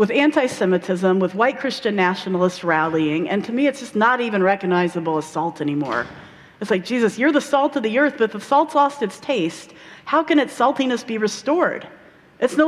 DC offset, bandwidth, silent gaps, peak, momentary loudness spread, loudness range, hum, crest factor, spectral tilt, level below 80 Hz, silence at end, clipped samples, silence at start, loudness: under 0.1%; 13 kHz; none; -4 dBFS; 7 LU; 2 LU; none; 16 dB; -5.5 dB/octave; -64 dBFS; 0 s; under 0.1%; 0 s; -20 LUFS